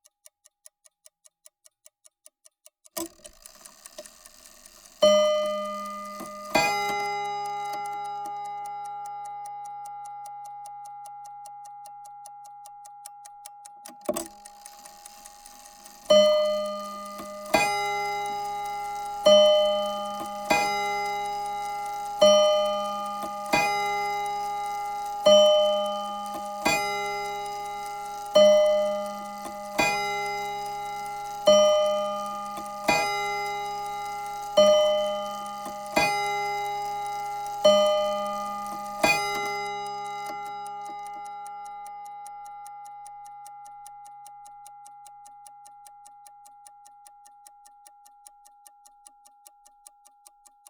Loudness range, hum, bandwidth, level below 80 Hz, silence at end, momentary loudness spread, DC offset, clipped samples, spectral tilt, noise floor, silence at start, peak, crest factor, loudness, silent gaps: 19 LU; none; over 20 kHz; -62 dBFS; 4.2 s; 25 LU; under 0.1%; under 0.1%; -2 dB/octave; -60 dBFS; 2.95 s; -6 dBFS; 22 dB; -25 LUFS; none